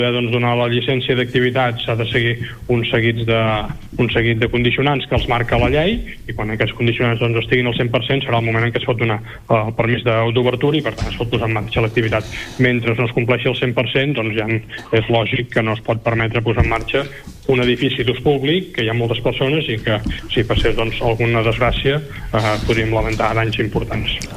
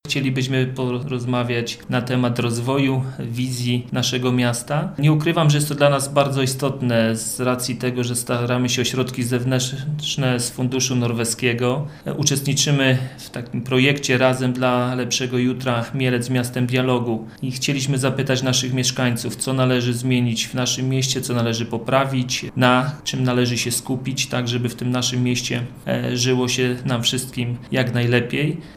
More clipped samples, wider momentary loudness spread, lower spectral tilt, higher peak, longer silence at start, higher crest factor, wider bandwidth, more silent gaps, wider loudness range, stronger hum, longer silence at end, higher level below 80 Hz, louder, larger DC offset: neither; about the same, 5 LU vs 7 LU; first, -6.5 dB/octave vs -4.5 dB/octave; about the same, -2 dBFS vs -2 dBFS; about the same, 0 s vs 0.05 s; about the same, 16 dB vs 20 dB; second, 14 kHz vs 16 kHz; neither; about the same, 1 LU vs 2 LU; neither; about the same, 0 s vs 0 s; first, -32 dBFS vs -52 dBFS; about the same, -18 LUFS vs -20 LUFS; neither